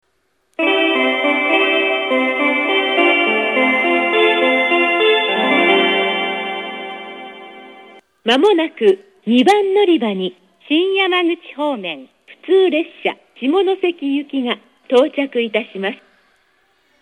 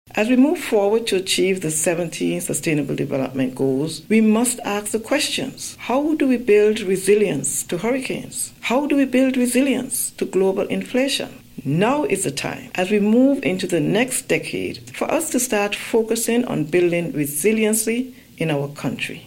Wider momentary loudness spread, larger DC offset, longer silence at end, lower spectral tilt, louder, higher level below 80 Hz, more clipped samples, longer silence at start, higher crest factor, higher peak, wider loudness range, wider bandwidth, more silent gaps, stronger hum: first, 12 LU vs 9 LU; neither; first, 1.05 s vs 0 s; about the same, -4.5 dB/octave vs -4 dB/octave; first, -15 LUFS vs -20 LUFS; second, -74 dBFS vs -56 dBFS; neither; first, 0.6 s vs 0.15 s; about the same, 16 dB vs 16 dB; first, 0 dBFS vs -4 dBFS; first, 5 LU vs 2 LU; second, 11.5 kHz vs 16.5 kHz; neither; neither